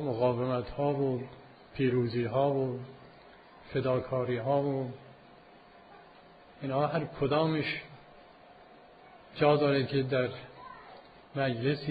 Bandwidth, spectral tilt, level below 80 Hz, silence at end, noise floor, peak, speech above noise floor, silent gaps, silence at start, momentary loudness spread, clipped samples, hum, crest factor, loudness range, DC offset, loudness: 5 kHz; -9.5 dB/octave; -62 dBFS; 0 s; -56 dBFS; -12 dBFS; 26 dB; none; 0 s; 19 LU; under 0.1%; none; 20 dB; 3 LU; under 0.1%; -31 LUFS